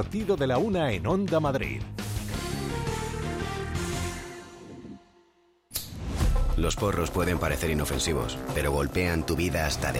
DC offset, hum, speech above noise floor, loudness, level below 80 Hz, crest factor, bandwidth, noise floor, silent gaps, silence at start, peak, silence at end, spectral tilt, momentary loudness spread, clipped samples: under 0.1%; none; 37 dB; -28 LUFS; -36 dBFS; 16 dB; 16.5 kHz; -64 dBFS; none; 0 s; -12 dBFS; 0 s; -5 dB/octave; 10 LU; under 0.1%